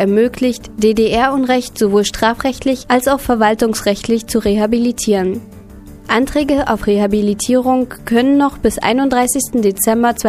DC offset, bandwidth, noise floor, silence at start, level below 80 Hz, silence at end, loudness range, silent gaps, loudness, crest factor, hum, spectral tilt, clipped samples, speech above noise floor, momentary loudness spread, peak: under 0.1%; 15.5 kHz; -35 dBFS; 0 s; -36 dBFS; 0 s; 2 LU; none; -14 LUFS; 14 dB; none; -4.5 dB/octave; under 0.1%; 21 dB; 4 LU; 0 dBFS